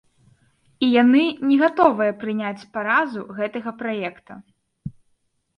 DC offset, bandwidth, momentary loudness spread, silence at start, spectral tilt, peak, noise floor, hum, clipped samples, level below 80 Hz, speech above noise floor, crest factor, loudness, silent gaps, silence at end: under 0.1%; 6 kHz; 16 LU; 0.8 s; -7 dB/octave; -2 dBFS; -68 dBFS; none; under 0.1%; -60 dBFS; 47 dB; 20 dB; -20 LUFS; none; 0.65 s